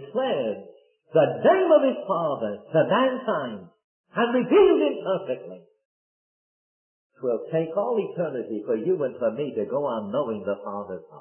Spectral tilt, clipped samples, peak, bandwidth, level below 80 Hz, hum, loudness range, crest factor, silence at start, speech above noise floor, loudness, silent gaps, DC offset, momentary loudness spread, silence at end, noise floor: -10.5 dB/octave; under 0.1%; -6 dBFS; 3.3 kHz; -68 dBFS; none; 7 LU; 18 dB; 0 s; over 66 dB; -24 LUFS; 3.84-4.04 s, 5.85-7.10 s; under 0.1%; 14 LU; 0 s; under -90 dBFS